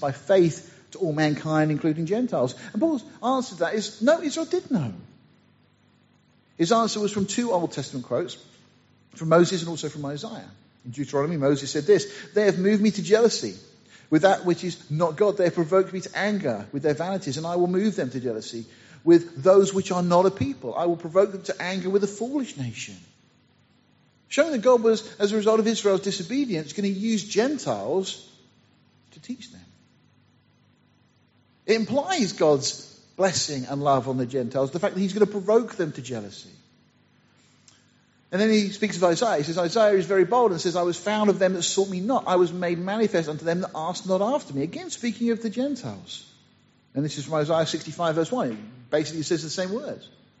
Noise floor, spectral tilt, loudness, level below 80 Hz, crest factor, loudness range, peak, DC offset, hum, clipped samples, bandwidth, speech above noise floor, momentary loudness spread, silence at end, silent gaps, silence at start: -62 dBFS; -5 dB/octave; -24 LUFS; -68 dBFS; 20 dB; 6 LU; -6 dBFS; under 0.1%; 50 Hz at -55 dBFS; under 0.1%; 8 kHz; 38 dB; 13 LU; 0.35 s; none; 0 s